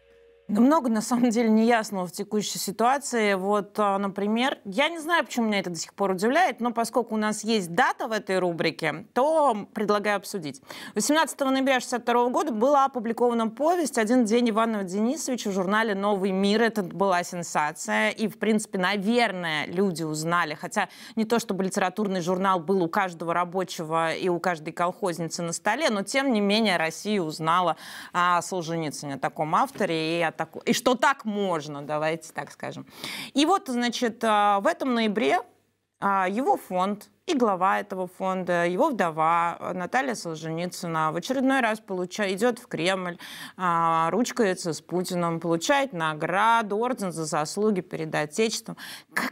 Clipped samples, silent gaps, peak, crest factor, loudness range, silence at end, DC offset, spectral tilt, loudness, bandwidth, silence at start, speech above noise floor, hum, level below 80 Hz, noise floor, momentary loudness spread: under 0.1%; none; -6 dBFS; 18 dB; 3 LU; 0 s; under 0.1%; -4.5 dB/octave; -25 LUFS; 16 kHz; 0.5 s; 31 dB; none; -72 dBFS; -56 dBFS; 8 LU